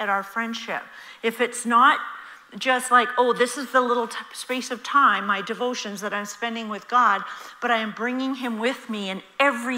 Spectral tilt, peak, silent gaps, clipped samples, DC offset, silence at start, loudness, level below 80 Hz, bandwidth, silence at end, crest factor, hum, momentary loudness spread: -2.5 dB/octave; -4 dBFS; none; under 0.1%; under 0.1%; 0 s; -23 LUFS; -78 dBFS; 16 kHz; 0 s; 20 dB; none; 13 LU